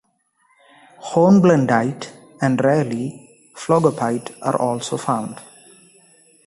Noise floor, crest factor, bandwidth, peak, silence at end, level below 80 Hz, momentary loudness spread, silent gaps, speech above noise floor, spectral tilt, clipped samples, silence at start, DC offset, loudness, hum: -63 dBFS; 18 dB; 11.5 kHz; -2 dBFS; 1.05 s; -60 dBFS; 19 LU; none; 46 dB; -6.5 dB/octave; under 0.1%; 1 s; under 0.1%; -18 LUFS; none